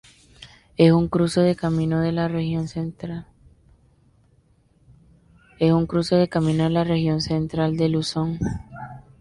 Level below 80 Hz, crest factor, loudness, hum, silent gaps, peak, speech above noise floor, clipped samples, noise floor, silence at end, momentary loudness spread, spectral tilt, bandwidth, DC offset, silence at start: -46 dBFS; 18 dB; -22 LUFS; none; none; -4 dBFS; 39 dB; under 0.1%; -59 dBFS; 0.2 s; 15 LU; -7 dB/octave; 11.5 kHz; under 0.1%; 0.4 s